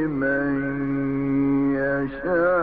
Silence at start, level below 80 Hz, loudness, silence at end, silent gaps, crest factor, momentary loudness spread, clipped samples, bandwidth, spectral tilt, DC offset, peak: 0 s; -46 dBFS; -23 LUFS; 0 s; none; 10 dB; 4 LU; under 0.1%; 4.5 kHz; -11 dB/octave; under 0.1%; -12 dBFS